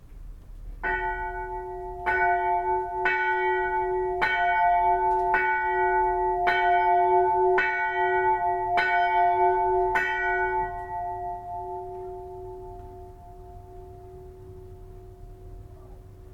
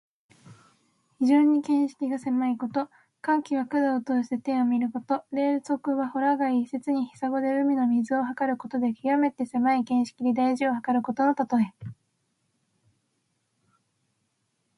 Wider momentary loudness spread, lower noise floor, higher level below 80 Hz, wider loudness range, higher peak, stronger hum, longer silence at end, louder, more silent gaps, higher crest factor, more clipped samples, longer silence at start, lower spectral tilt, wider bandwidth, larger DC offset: first, 22 LU vs 6 LU; second, -45 dBFS vs -75 dBFS; first, -46 dBFS vs -72 dBFS; first, 17 LU vs 3 LU; about the same, -10 dBFS vs -10 dBFS; neither; second, 0 s vs 2.85 s; about the same, -24 LUFS vs -26 LUFS; neither; about the same, 16 dB vs 16 dB; neither; second, 0 s vs 0.5 s; about the same, -6 dB/octave vs -6.5 dB/octave; second, 7.6 kHz vs 11 kHz; neither